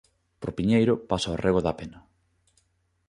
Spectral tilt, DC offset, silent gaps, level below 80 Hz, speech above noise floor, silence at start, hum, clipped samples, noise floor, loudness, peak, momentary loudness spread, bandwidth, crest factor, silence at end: -6.5 dB/octave; under 0.1%; none; -48 dBFS; 45 dB; 0.4 s; none; under 0.1%; -70 dBFS; -25 LUFS; -8 dBFS; 15 LU; 10.5 kHz; 20 dB; 1.1 s